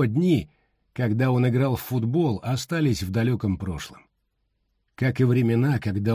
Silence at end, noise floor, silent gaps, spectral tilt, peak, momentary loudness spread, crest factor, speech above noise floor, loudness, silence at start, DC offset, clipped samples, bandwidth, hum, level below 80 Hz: 0 s; -73 dBFS; none; -7.5 dB/octave; -10 dBFS; 9 LU; 14 dB; 51 dB; -24 LUFS; 0 s; under 0.1%; under 0.1%; 16 kHz; none; -46 dBFS